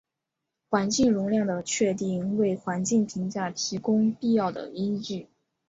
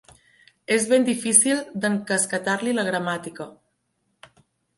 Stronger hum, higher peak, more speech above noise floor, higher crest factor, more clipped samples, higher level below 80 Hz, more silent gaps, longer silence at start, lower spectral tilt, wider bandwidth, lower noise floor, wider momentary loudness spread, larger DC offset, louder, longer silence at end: neither; second, -10 dBFS vs 0 dBFS; first, 59 dB vs 50 dB; second, 18 dB vs 24 dB; neither; first, -62 dBFS vs -70 dBFS; neither; about the same, 0.7 s vs 0.7 s; first, -5 dB/octave vs -3 dB/octave; second, 8 kHz vs 12 kHz; first, -85 dBFS vs -73 dBFS; second, 8 LU vs 19 LU; neither; second, -26 LUFS vs -21 LUFS; second, 0.45 s vs 1.25 s